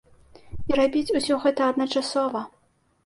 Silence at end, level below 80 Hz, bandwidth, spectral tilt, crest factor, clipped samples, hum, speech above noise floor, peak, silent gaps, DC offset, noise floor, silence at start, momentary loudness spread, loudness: 0.6 s; -52 dBFS; 11.5 kHz; -4 dB/octave; 16 dB; under 0.1%; none; 42 dB; -8 dBFS; none; under 0.1%; -65 dBFS; 0.45 s; 14 LU; -24 LUFS